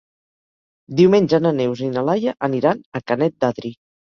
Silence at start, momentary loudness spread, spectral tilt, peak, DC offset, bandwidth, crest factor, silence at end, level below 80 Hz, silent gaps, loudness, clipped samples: 0.9 s; 12 LU; -7.5 dB/octave; -2 dBFS; under 0.1%; 7 kHz; 18 dB; 0.45 s; -60 dBFS; 2.86-2.92 s; -19 LUFS; under 0.1%